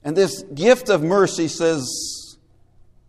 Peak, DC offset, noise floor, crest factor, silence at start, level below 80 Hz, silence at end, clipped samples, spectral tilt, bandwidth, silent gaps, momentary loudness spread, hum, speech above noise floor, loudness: 0 dBFS; under 0.1%; -52 dBFS; 20 dB; 0.05 s; -56 dBFS; 0.75 s; under 0.1%; -4 dB/octave; 15 kHz; none; 10 LU; none; 33 dB; -19 LUFS